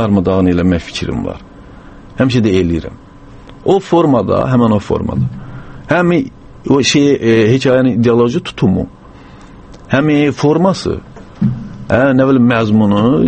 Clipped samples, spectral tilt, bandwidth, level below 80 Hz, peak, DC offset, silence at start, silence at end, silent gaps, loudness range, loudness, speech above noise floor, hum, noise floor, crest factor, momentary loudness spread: under 0.1%; -6.5 dB/octave; 8.8 kHz; -36 dBFS; 0 dBFS; under 0.1%; 0 s; 0 s; none; 4 LU; -13 LUFS; 25 dB; none; -36 dBFS; 12 dB; 14 LU